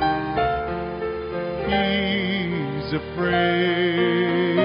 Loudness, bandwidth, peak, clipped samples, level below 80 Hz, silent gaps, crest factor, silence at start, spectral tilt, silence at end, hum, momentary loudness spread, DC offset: -23 LUFS; 5.4 kHz; -8 dBFS; under 0.1%; -44 dBFS; none; 16 dB; 0 s; -4 dB/octave; 0 s; none; 8 LU; under 0.1%